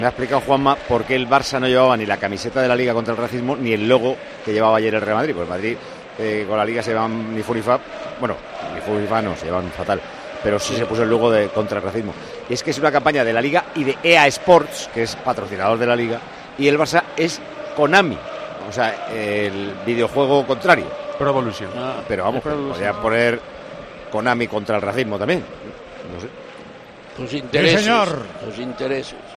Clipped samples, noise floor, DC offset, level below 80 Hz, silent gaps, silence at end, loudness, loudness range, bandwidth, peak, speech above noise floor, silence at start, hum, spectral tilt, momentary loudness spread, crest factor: under 0.1%; -39 dBFS; under 0.1%; -50 dBFS; none; 0 s; -19 LUFS; 6 LU; 13 kHz; 0 dBFS; 20 dB; 0 s; none; -5 dB/octave; 15 LU; 20 dB